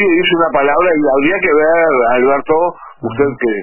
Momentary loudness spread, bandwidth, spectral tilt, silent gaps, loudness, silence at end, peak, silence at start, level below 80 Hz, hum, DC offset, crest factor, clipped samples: 6 LU; 3.1 kHz; -9.5 dB/octave; none; -12 LUFS; 0 s; 0 dBFS; 0 s; -44 dBFS; none; under 0.1%; 12 dB; under 0.1%